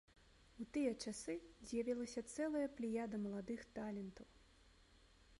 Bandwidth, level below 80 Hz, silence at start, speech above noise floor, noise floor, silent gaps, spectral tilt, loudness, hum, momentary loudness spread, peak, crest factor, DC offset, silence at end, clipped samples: 11.5 kHz; -70 dBFS; 0.2 s; 24 dB; -69 dBFS; none; -5 dB/octave; -45 LUFS; none; 9 LU; -28 dBFS; 18 dB; under 0.1%; 0.05 s; under 0.1%